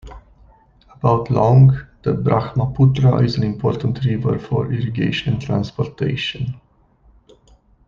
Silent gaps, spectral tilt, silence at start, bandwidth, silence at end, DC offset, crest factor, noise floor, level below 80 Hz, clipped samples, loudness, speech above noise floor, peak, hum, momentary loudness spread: none; -8.5 dB/octave; 0.05 s; 6.6 kHz; 1.3 s; under 0.1%; 16 dB; -53 dBFS; -42 dBFS; under 0.1%; -18 LUFS; 37 dB; -2 dBFS; none; 9 LU